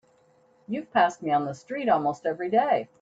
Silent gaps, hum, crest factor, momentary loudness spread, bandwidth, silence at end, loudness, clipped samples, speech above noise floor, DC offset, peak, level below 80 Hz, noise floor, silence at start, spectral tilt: none; none; 18 dB; 9 LU; 8 kHz; 0.15 s; -26 LUFS; under 0.1%; 36 dB; under 0.1%; -10 dBFS; -70 dBFS; -62 dBFS; 0.7 s; -6 dB/octave